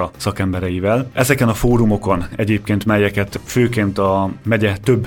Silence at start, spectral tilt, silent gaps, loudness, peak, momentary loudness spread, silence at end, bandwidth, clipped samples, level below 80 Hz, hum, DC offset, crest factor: 0 s; -6.5 dB/octave; none; -17 LUFS; 0 dBFS; 5 LU; 0 s; 17.5 kHz; under 0.1%; -34 dBFS; none; under 0.1%; 16 dB